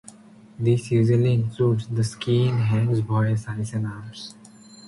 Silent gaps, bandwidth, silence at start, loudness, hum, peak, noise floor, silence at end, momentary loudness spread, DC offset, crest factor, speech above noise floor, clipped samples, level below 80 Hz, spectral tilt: none; 11.5 kHz; 0.6 s; -23 LUFS; none; -8 dBFS; -47 dBFS; 0 s; 12 LU; under 0.1%; 14 dB; 25 dB; under 0.1%; -54 dBFS; -7.5 dB/octave